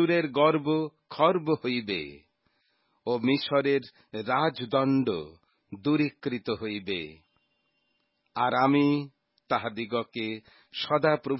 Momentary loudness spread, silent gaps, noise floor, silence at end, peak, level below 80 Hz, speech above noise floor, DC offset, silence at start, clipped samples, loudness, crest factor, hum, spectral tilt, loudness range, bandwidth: 15 LU; none; -75 dBFS; 0 s; -8 dBFS; -66 dBFS; 48 dB; under 0.1%; 0 s; under 0.1%; -27 LUFS; 20 dB; none; -10 dB/octave; 3 LU; 5.8 kHz